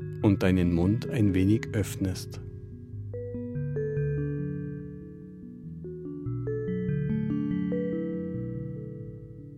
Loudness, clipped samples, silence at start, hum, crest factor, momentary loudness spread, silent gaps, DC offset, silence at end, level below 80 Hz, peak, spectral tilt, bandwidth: -30 LUFS; under 0.1%; 0 s; none; 22 dB; 18 LU; none; under 0.1%; 0 s; -50 dBFS; -8 dBFS; -8 dB/octave; 15.5 kHz